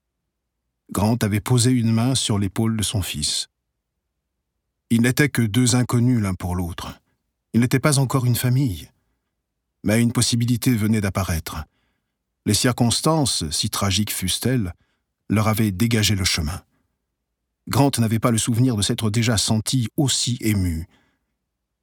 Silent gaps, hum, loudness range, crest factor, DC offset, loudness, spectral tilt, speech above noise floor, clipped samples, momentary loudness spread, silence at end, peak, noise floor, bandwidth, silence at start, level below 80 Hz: none; none; 2 LU; 18 dB; under 0.1%; -20 LUFS; -4.5 dB/octave; 58 dB; under 0.1%; 8 LU; 1 s; -4 dBFS; -78 dBFS; 18.5 kHz; 0.9 s; -46 dBFS